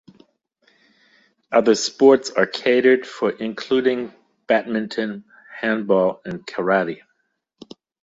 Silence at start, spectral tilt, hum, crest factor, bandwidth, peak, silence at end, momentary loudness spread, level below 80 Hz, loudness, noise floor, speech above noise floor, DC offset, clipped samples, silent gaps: 1.5 s; -4.5 dB/octave; none; 18 dB; 7.8 kHz; -2 dBFS; 1.05 s; 14 LU; -66 dBFS; -20 LUFS; -71 dBFS; 52 dB; under 0.1%; under 0.1%; none